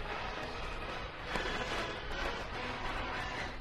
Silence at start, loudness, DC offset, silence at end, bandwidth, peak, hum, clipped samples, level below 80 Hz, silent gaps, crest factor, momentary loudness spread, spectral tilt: 0 s; -39 LUFS; under 0.1%; 0 s; 13 kHz; -16 dBFS; none; under 0.1%; -46 dBFS; none; 22 dB; 5 LU; -4 dB/octave